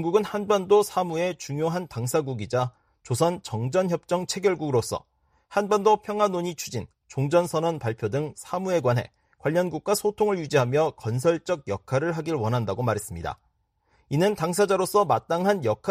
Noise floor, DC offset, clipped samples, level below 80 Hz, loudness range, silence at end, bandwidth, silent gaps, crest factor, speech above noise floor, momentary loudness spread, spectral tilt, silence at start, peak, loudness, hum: -69 dBFS; under 0.1%; under 0.1%; -58 dBFS; 2 LU; 0 s; 15.5 kHz; none; 18 dB; 44 dB; 9 LU; -5.5 dB/octave; 0 s; -8 dBFS; -25 LUFS; none